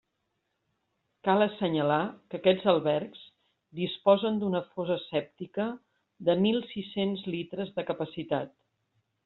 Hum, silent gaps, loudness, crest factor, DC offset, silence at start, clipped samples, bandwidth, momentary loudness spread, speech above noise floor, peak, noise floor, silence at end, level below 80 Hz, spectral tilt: none; none; -29 LUFS; 22 dB; under 0.1%; 1.25 s; under 0.1%; 4.3 kHz; 10 LU; 51 dB; -8 dBFS; -80 dBFS; 0.75 s; -72 dBFS; -4.5 dB/octave